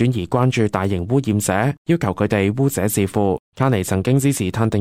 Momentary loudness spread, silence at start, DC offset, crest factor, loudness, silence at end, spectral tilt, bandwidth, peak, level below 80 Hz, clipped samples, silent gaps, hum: 3 LU; 0 s; under 0.1%; 16 dB; -19 LUFS; 0 s; -6 dB/octave; 16 kHz; -2 dBFS; -46 dBFS; under 0.1%; 1.78-1.85 s, 3.39-3.52 s; none